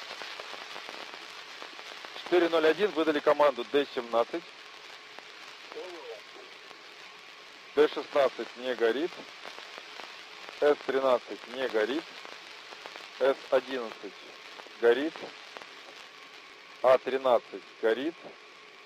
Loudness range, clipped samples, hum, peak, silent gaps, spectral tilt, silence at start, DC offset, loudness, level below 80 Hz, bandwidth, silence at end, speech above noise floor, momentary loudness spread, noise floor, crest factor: 7 LU; under 0.1%; none; -10 dBFS; none; -4 dB/octave; 0 s; under 0.1%; -29 LUFS; -84 dBFS; 15.5 kHz; 0.05 s; 22 dB; 21 LU; -50 dBFS; 20 dB